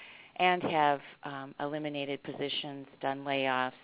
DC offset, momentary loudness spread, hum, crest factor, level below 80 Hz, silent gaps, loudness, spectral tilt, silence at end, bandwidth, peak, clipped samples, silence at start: under 0.1%; 14 LU; none; 22 dB; -76 dBFS; none; -32 LUFS; -2 dB/octave; 0.05 s; 4 kHz; -12 dBFS; under 0.1%; 0 s